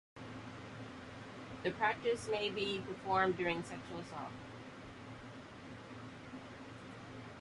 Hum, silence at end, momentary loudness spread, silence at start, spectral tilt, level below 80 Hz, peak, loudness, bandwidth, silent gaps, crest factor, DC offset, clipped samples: none; 0 s; 17 LU; 0.15 s; -5 dB/octave; -66 dBFS; -20 dBFS; -40 LUFS; 11.5 kHz; none; 22 dB; under 0.1%; under 0.1%